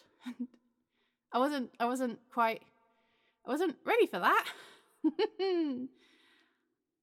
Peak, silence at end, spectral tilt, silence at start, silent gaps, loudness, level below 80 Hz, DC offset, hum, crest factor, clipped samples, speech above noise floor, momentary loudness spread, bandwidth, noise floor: -14 dBFS; 1.15 s; -4 dB/octave; 0.25 s; none; -33 LUFS; under -90 dBFS; under 0.1%; none; 20 dB; under 0.1%; 50 dB; 16 LU; 16.5 kHz; -82 dBFS